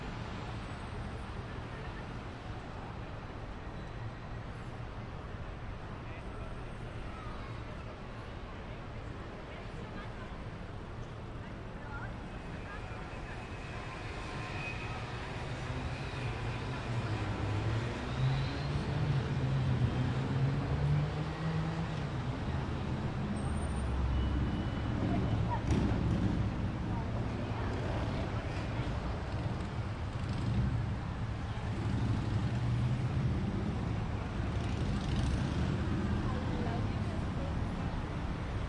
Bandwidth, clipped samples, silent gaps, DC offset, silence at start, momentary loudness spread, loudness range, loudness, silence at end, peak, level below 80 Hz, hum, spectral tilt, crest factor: 10.5 kHz; under 0.1%; none; under 0.1%; 0 s; 11 LU; 11 LU; -37 LUFS; 0 s; -20 dBFS; -44 dBFS; none; -7 dB/octave; 16 dB